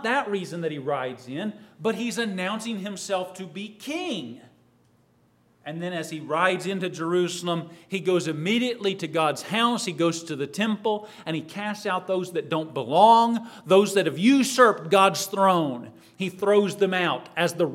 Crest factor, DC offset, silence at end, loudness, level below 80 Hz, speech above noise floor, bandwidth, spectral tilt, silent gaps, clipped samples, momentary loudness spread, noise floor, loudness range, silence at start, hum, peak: 20 dB; under 0.1%; 0 s; -24 LUFS; -78 dBFS; 38 dB; 16 kHz; -4.5 dB/octave; none; under 0.1%; 13 LU; -62 dBFS; 11 LU; 0 s; none; -4 dBFS